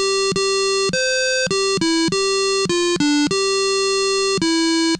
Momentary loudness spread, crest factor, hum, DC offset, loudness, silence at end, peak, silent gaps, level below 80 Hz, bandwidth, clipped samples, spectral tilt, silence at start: 1 LU; 10 dB; none; under 0.1%; -17 LUFS; 0 s; -8 dBFS; none; -52 dBFS; 11 kHz; under 0.1%; -2.5 dB/octave; 0 s